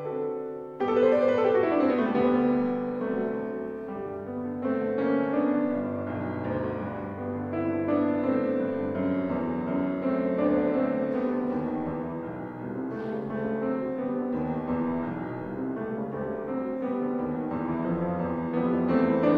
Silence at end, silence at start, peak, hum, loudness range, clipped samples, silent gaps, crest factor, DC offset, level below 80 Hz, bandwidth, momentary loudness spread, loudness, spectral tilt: 0 s; 0 s; -10 dBFS; none; 6 LU; under 0.1%; none; 16 dB; under 0.1%; -58 dBFS; 5.2 kHz; 10 LU; -28 LUFS; -9.5 dB/octave